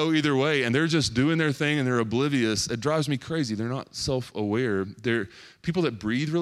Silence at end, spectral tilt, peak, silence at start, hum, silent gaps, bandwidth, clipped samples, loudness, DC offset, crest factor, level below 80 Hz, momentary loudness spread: 0 s; -5 dB/octave; -10 dBFS; 0 s; none; none; 14 kHz; under 0.1%; -26 LUFS; under 0.1%; 14 dB; -54 dBFS; 6 LU